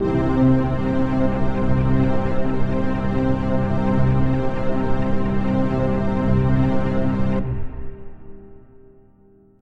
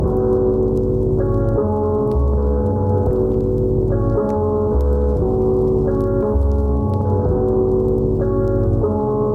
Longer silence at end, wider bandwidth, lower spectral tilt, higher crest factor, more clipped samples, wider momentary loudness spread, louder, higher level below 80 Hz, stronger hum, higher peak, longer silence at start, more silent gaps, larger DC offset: first, 1.05 s vs 0 s; first, 6 kHz vs 1.9 kHz; second, -9.5 dB/octave vs -12 dB/octave; about the same, 14 dB vs 10 dB; neither; first, 5 LU vs 2 LU; second, -21 LUFS vs -18 LUFS; second, -30 dBFS vs -24 dBFS; neither; about the same, -4 dBFS vs -6 dBFS; about the same, 0 s vs 0 s; neither; neither